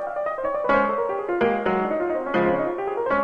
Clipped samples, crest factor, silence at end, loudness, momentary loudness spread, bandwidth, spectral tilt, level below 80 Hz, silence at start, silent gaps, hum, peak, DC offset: under 0.1%; 16 dB; 0 s; -23 LUFS; 5 LU; 7.2 kHz; -8 dB/octave; -52 dBFS; 0 s; none; none; -6 dBFS; under 0.1%